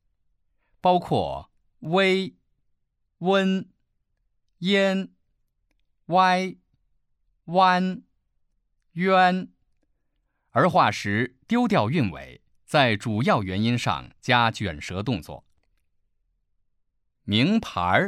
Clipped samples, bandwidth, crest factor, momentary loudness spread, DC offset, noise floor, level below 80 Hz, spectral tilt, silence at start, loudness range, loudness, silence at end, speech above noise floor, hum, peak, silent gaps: under 0.1%; 13 kHz; 20 dB; 12 LU; under 0.1%; -73 dBFS; -56 dBFS; -6 dB/octave; 0.85 s; 4 LU; -23 LUFS; 0 s; 50 dB; none; -4 dBFS; none